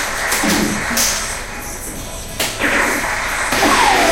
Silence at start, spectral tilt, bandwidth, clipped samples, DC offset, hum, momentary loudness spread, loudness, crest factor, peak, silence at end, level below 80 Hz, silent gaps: 0 s; -2 dB/octave; 16 kHz; under 0.1%; 0.2%; none; 14 LU; -16 LUFS; 16 dB; 0 dBFS; 0 s; -32 dBFS; none